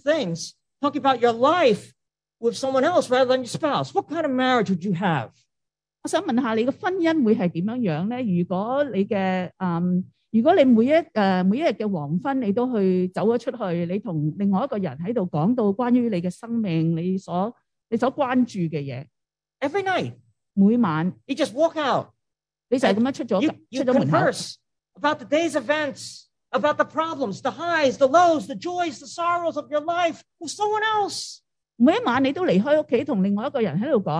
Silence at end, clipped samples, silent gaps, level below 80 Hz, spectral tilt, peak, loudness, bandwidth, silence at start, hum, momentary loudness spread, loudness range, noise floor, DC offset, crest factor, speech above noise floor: 0 s; under 0.1%; none; -70 dBFS; -6 dB/octave; -4 dBFS; -23 LUFS; 11 kHz; 0.05 s; none; 9 LU; 4 LU; -85 dBFS; under 0.1%; 18 dB; 63 dB